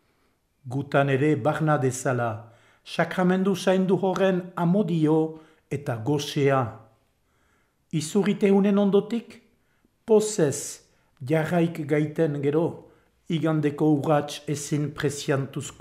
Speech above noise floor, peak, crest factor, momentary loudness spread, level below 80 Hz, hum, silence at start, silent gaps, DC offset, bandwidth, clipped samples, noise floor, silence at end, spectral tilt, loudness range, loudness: 45 dB; -8 dBFS; 18 dB; 11 LU; -66 dBFS; none; 0.65 s; none; under 0.1%; 15.5 kHz; under 0.1%; -68 dBFS; 0.1 s; -6 dB/octave; 2 LU; -24 LUFS